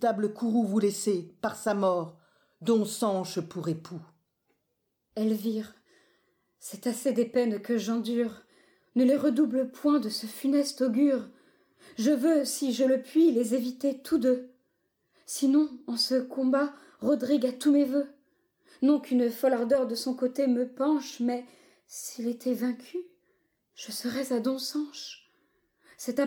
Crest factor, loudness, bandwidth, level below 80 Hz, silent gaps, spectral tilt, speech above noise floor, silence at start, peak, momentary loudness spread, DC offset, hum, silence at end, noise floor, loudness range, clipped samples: 14 dB; -28 LUFS; 18.5 kHz; -78 dBFS; none; -5 dB/octave; 52 dB; 0 s; -14 dBFS; 13 LU; under 0.1%; none; 0 s; -79 dBFS; 7 LU; under 0.1%